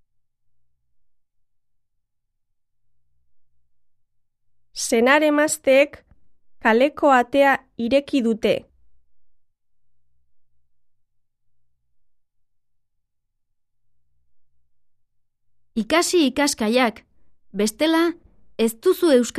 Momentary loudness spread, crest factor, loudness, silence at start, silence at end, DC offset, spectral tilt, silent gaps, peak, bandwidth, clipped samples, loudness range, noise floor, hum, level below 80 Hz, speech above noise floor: 9 LU; 20 dB; -19 LUFS; 4.75 s; 0 s; under 0.1%; -3 dB/octave; none; -4 dBFS; 14 kHz; under 0.1%; 10 LU; -72 dBFS; none; -60 dBFS; 54 dB